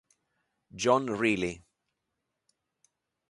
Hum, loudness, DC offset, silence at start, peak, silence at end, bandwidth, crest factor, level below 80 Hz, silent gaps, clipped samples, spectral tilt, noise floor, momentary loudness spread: none; -28 LUFS; under 0.1%; 0.75 s; -10 dBFS; 1.7 s; 11.5 kHz; 24 dB; -64 dBFS; none; under 0.1%; -4.5 dB/octave; -84 dBFS; 10 LU